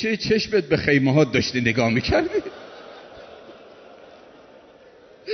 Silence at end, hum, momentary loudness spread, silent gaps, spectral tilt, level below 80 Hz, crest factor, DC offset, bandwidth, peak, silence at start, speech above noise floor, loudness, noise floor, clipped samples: 0 s; none; 24 LU; none; -5.5 dB/octave; -46 dBFS; 18 dB; under 0.1%; 6.4 kHz; -4 dBFS; 0 s; 29 dB; -20 LUFS; -49 dBFS; under 0.1%